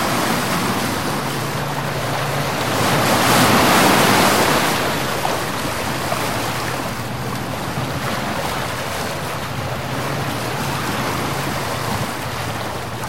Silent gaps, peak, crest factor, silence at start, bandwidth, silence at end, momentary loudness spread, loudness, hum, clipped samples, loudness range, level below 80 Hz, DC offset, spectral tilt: none; -2 dBFS; 18 dB; 0 s; 16.5 kHz; 0 s; 11 LU; -19 LUFS; none; under 0.1%; 8 LU; -44 dBFS; 2%; -4 dB/octave